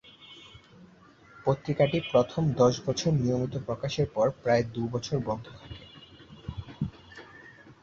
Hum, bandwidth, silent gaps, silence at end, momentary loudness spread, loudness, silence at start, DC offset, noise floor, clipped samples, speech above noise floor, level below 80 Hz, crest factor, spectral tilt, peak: none; 7.6 kHz; none; 0.1 s; 24 LU; -28 LUFS; 0.2 s; under 0.1%; -55 dBFS; under 0.1%; 28 dB; -54 dBFS; 20 dB; -6.5 dB/octave; -10 dBFS